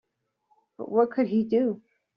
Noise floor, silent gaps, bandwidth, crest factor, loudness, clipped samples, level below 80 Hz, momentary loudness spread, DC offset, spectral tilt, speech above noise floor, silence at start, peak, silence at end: -71 dBFS; none; 5.4 kHz; 18 dB; -25 LUFS; under 0.1%; -72 dBFS; 14 LU; under 0.1%; -7 dB/octave; 47 dB; 0.8 s; -10 dBFS; 0.4 s